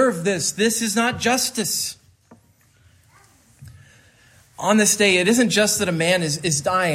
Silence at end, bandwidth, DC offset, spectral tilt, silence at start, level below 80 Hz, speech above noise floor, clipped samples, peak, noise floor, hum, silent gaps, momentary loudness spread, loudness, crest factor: 0 s; 16 kHz; under 0.1%; -3 dB/octave; 0 s; -60 dBFS; 37 dB; under 0.1%; -4 dBFS; -56 dBFS; none; none; 6 LU; -19 LUFS; 16 dB